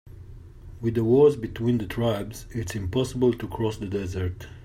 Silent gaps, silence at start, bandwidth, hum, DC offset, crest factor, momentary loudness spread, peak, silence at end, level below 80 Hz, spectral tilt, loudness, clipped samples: none; 0.05 s; 15.5 kHz; none; under 0.1%; 18 dB; 13 LU; -8 dBFS; 0 s; -46 dBFS; -7 dB/octave; -25 LUFS; under 0.1%